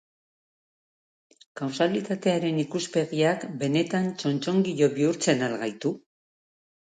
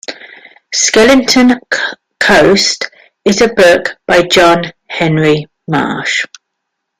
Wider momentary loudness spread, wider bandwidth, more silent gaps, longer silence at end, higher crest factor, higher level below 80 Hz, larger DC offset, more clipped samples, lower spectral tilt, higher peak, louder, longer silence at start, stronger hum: second, 8 LU vs 12 LU; second, 9.4 kHz vs 16 kHz; neither; first, 0.95 s vs 0.75 s; first, 18 dB vs 12 dB; second, -72 dBFS vs -42 dBFS; neither; neither; first, -5.5 dB/octave vs -3.5 dB/octave; second, -8 dBFS vs 0 dBFS; second, -26 LUFS vs -10 LUFS; first, 1.55 s vs 0.1 s; neither